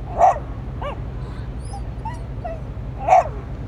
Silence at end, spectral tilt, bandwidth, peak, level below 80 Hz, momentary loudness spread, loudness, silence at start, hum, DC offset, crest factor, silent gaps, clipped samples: 0 s; -7 dB/octave; 11 kHz; -2 dBFS; -32 dBFS; 15 LU; -23 LUFS; 0 s; none; under 0.1%; 20 dB; none; under 0.1%